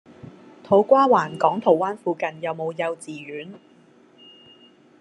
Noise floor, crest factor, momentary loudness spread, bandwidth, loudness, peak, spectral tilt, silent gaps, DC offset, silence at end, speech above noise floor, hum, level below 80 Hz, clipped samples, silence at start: -54 dBFS; 20 dB; 18 LU; 11 kHz; -21 LUFS; -2 dBFS; -6.5 dB/octave; none; under 0.1%; 1.45 s; 33 dB; none; -72 dBFS; under 0.1%; 0.25 s